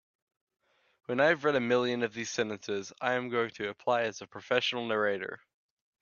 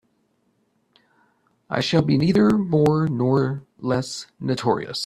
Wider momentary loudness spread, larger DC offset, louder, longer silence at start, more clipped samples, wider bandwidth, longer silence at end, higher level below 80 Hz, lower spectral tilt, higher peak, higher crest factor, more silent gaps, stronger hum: about the same, 10 LU vs 11 LU; neither; second, -31 LUFS vs -21 LUFS; second, 1.1 s vs 1.7 s; neither; second, 7.2 kHz vs 12.5 kHz; first, 0.65 s vs 0 s; second, -76 dBFS vs -56 dBFS; second, -4 dB/octave vs -6.5 dB/octave; second, -10 dBFS vs -4 dBFS; about the same, 22 dB vs 18 dB; neither; neither